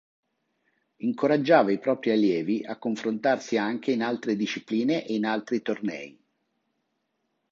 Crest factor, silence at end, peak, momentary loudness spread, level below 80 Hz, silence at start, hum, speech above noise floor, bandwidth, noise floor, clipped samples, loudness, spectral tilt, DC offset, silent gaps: 22 dB; 1.4 s; -6 dBFS; 11 LU; -76 dBFS; 1 s; none; 52 dB; 7.6 kHz; -77 dBFS; under 0.1%; -26 LUFS; -6 dB/octave; under 0.1%; none